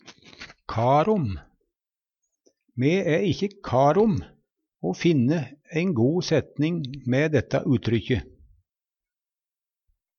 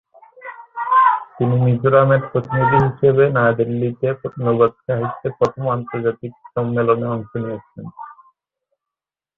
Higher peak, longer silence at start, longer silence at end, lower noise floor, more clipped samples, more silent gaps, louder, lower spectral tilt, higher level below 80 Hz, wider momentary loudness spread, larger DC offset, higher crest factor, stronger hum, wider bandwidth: second, -8 dBFS vs -2 dBFS; second, 0.05 s vs 0.4 s; first, 1.95 s vs 1.25 s; about the same, under -90 dBFS vs -88 dBFS; neither; neither; second, -24 LUFS vs -18 LUFS; second, -7 dB/octave vs -9.5 dB/octave; about the same, -52 dBFS vs -52 dBFS; second, 12 LU vs 19 LU; neither; about the same, 18 dB vs 16 dB; neither; first, 7 kHz vs 5 kHz